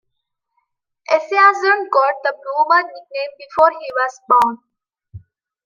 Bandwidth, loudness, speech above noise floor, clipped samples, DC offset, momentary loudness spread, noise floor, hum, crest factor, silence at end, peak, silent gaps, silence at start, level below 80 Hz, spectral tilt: 15.5 kHz; -16 LUFS; 59 dB; under 0.1%; under 0.1%; 14 LU; -75 dBFS; none; 16 dB; 0.5 s; -2 dBFS; none; 1.1 s; -62 dBFS; -3.5 dB/octave